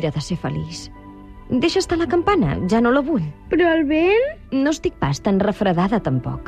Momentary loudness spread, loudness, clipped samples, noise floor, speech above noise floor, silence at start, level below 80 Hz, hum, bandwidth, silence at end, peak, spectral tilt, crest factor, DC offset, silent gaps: 8 LU; -19 LUFS; under 0.1%; -39 dBFS; 20 dB; 0 s; -40 dBFS; none; 11.5 kHz; 0 s; -6 dBFS; -6 dB/octave; 14 dB; under 0.1%; none